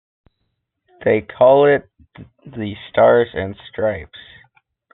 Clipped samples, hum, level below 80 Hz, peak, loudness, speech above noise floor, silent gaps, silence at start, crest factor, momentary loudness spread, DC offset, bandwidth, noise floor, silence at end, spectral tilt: under 0.1%; none; -54 dBFS; -2 dBFS; -16 LUFS; 56 dB; none; 1 s; 16 dB; 17 LU; under 0.1%; 4.1 kHz; -73 dBFS; 0.75 s; -4.5 dB/octave